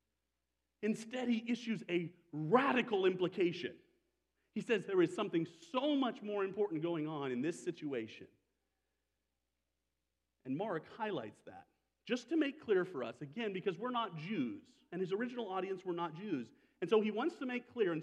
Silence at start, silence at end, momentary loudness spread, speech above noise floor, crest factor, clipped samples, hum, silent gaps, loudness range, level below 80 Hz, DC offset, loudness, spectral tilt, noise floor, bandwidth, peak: 0.8 s; 0 s; 12 LU; 50 dB; 24 dB; under 0.1%; none; none; 10 LU; -88 dBFS; under 0.1%; -38 LUFS; -6 dB/octave; -88 dBFS; 11 kHz; -14 dBFS